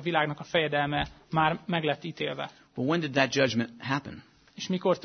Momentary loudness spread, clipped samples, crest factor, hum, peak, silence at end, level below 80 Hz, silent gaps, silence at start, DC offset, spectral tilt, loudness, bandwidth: 10 LU; under 0.1%; 22 dB; none; -6 dBFS; 0.05 s; -56 dBFS; none; 0 s; under 0.1%; -5 dB/octave; -29 LUFS; 6.6 kHz